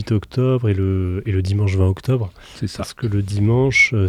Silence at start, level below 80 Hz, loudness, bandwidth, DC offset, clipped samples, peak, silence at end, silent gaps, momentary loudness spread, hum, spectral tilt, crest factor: 0 s; -44 dBFS; -19 LUFS; 11 kHz; under 0.1%; under 0.1%; -4 dBFS; 0 s; none; 12 LU; none; -6.5 dB/octave; 14 dB